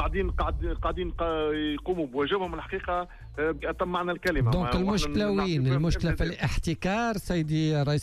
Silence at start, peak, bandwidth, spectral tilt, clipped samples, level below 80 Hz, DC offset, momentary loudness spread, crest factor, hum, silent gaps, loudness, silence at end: 0 s; -16 dBFS; 14 kHz; -6.5 dB/octave; under 0.1%; -36 dBFS; under 0.1%; 5 LU; 12 dB; none; none; -28 LUFS; 0 s